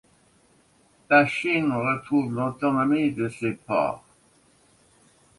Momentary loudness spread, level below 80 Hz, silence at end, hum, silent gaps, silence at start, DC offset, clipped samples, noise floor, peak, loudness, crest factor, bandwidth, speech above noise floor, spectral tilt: 9 LU; -64 dBFS; 1.4 s; none; none; 1.1 s; under 0.1%; under 0.1%; -61 dBFS; -4 dBFS; -24 LUFS; 22 dB; 11.5 kHz; 37 dB; -6.5 dB/octave